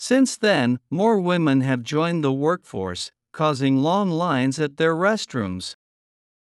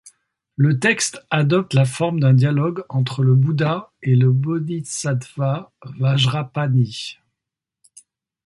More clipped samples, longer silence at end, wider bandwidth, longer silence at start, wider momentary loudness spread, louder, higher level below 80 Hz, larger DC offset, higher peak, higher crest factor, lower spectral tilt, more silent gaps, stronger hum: neither; second, 0.8 s vs 1.3 s; about the same, 12 kHz vs 11.5 kHz; about the same, 0 s vs 0.05 s; about the same, 10 LU vs 8 LU; about the same, -21 LUFS vs -19 LUFS; second, -70 dBFS vs -58 dBFS; neither; second, -6 dBFS vs -2 dBFS; about the same, 16 dB vs 16 dB; about the same, -5.5 dB/octave vs -5.5 dB/octave; neither; neither